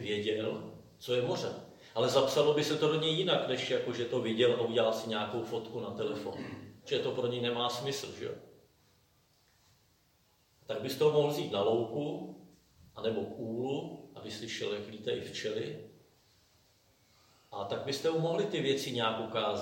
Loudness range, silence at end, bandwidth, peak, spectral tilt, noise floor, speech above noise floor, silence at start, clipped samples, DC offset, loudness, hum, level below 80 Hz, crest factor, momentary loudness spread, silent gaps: 10 LU; 0 s; 16.5 kHz; -14 dBFS; -5 dB/octave; -70 dBFS; 37 dB; 0 s; under 0.1%; under 0.1%; -33 LUFS; none; -74 dBFS; 20 dB; 14 LU; none